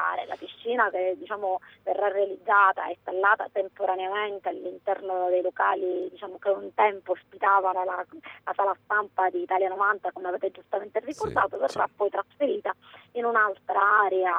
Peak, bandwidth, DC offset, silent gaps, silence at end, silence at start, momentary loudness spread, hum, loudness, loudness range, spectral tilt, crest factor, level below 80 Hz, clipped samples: -8 dBFS; 10 kHz; under 0.1%; none; 0 s; 0 s; 11 LU; none; -26 LUFS; 3 LU; -5 dB/octave; 18 dB; -68 dBFS; under 0.1%